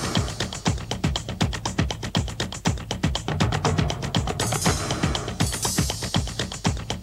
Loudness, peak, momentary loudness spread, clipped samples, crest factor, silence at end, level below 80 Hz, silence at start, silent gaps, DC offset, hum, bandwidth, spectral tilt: -25 LUFS; -8 dBFS; 4 LU; under 0.1%; 18 dB; 0 s; -36 dBFS; 0 s; none; under 0.1%; none; 16 kHz; -4 dB/octave